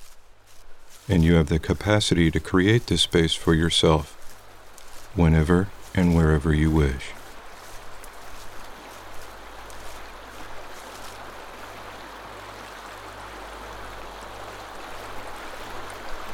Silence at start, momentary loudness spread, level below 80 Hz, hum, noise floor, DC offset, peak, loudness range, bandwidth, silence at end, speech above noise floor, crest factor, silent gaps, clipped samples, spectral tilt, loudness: 0 s; 22 LU; -36 dBFS; none; -44 dBFS; under 0.1%; -4 dBFS; 19 LU; 16 kHz; 0 s; 24 dB; 22 dB; none; under 0.1%; -5.5 dB/octave; -21 LUFS